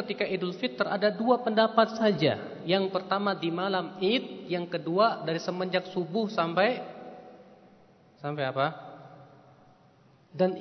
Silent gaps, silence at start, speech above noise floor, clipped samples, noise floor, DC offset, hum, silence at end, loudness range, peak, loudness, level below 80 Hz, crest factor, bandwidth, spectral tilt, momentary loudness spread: none; 0 s; 32 dB; under 0.1%; -60 dBFS; under 0.1%; none; 0 s; 9 LU; -6 dBFS; -28 LUFS; -78 dBFS; 22 dB; 6.4 kHz; -6.5 dB/octave; 14 LU